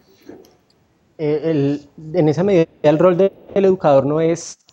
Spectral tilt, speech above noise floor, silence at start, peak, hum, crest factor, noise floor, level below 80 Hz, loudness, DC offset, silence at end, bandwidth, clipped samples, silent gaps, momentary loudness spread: -7 dB/octave; 42 dB; 0.3 s; -2 dBFS; none; 16 dB; -58 dBFS; -56 dBFS; -17 LUFS; under 0.1%; 0.2 s; 9 kHz; under 0.1%; none; 9 LU